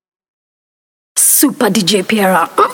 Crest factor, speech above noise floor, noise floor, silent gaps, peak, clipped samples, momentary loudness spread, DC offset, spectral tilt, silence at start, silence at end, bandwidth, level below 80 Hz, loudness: 14 dB; over 78 dB; under -90 dBFS; none; 0 dBFS; under 0.1%; 5 LU; under 0.1%; -2.5 dB/octave; 1.15 s; 0 s; 19 kHz; -60 dBFS; -11 LUFS